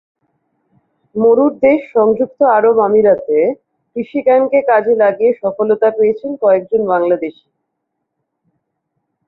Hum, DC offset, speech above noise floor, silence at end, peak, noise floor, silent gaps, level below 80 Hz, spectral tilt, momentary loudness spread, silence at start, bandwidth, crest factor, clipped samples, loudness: none; under 0.1%; 61 dB; 1.95 s; -2 dBFS; -73 dBFS; none; -58 dBFS; -10 dB/octave; 8 LU; 1.15 s; 4.1 kHz; 14 dB; under 0.1%; -13 LUFS